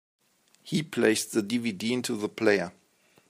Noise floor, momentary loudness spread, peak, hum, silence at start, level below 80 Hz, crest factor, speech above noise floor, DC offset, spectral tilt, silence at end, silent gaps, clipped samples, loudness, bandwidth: -64 dBFS; 7 LU; -8 dBFS; none; 0.65 s; -74 dBFS; 22 dB; 37 dB; under 0.1%; -4 dB/octave; 0.6 s; none; under 0.1%; -27 LUFS; 15.5 kHz